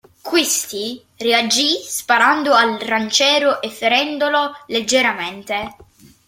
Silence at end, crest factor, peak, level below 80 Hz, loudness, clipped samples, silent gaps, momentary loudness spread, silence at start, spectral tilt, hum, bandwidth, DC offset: 0.55 s; 18 dB; 0 dBFS; -60 dBFS; -16 LUFS; under 0.1%; none; 11 LU; 0.25 s; -1 dB/octave; none; 16.5 kHz; under 0.1%